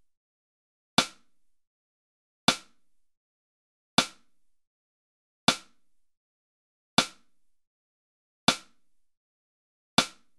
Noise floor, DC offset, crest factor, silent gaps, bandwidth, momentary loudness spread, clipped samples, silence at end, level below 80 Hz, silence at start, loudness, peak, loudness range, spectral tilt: -70 dBFS; under 0.1%; 30 dB; 1.67-2.48 s, 3.17-3.98 s, 4.67-5.47 s, 6.17-6.97 s, 7.67-8.47 s, 9.17-9.97 s; 12.5 kHz; 8 LU; under 0.1%; 0.3 s; -66 dBFS; 1 s; -28 LUFS; -4 dBFS; 0 LU; -2 dB/octave